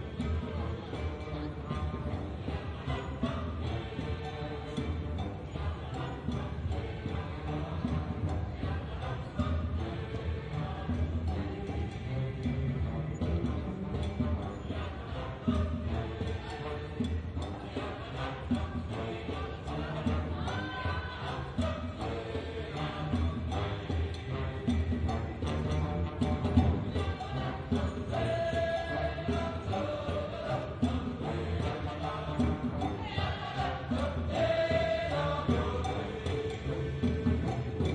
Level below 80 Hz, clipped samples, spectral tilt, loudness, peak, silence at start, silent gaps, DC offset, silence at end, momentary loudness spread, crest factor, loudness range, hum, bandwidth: -44 dBFS; under 0.1%; -7.5 dB/octave; -35 LUFS; -12 dBFS; 0 s; none; under 0.1%; 0 s; 7 LU; 22 dB; 5 LU; none; 9.6 kHz